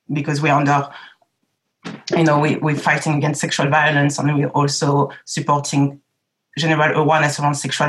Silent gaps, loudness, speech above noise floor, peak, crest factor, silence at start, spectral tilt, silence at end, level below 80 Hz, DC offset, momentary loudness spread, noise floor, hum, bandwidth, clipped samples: none; -17 LUFS; 55 dB; -4 dBFS; 14 dB; 0.1 s; -5 dB/octave; 0 s; -68 dBFS; under 0.1%; 7 LU; -72 dBFS; none; 12 kHz; under 0.1%